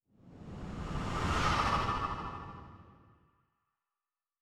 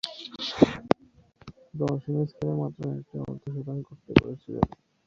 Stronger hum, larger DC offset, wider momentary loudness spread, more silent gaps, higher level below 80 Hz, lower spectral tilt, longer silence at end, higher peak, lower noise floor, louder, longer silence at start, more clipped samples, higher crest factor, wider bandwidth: neither; neither; first, 20 LU vs 13 LU; neither; about the same, -46 dBFS vs -48 dBFS; second, -5 dB/octave vs -7.5 dB/octave; first, 1.5 s vs 0.4 s; second, -18 dBFS vs -2 dBFS; first, under -90 dBFS vs -57 dBFS; second, -34 LUFS vs -28 LUFS; first, 0.25 s vs 0.05 s; neither; second, 20 dB vs 28 dB; first, 14.5 kHz vs 8.6 kHz